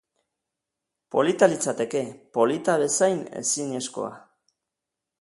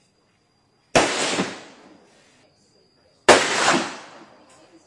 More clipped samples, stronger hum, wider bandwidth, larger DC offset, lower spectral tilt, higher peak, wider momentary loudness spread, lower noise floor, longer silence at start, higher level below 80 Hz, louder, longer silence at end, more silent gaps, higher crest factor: neither; neither; about the same, 11.5 kHz vs 11.5 kHz; neither; first, -3.5 dB/octave vs -2 dB/octave; second, -4 dBFS vs 0 dBFS; second, 10 LU vs 16 LU; first, -86 dBFS vs -63 dBFS; first, 1.15 s vs 0.95 s; second, -72 dBFS vs -56 dBFS; second, -24 LUFS vs -19 LUFS; first, 1.05 s vs 0.8 s; neither; about the same, 22 dB vs 24 dB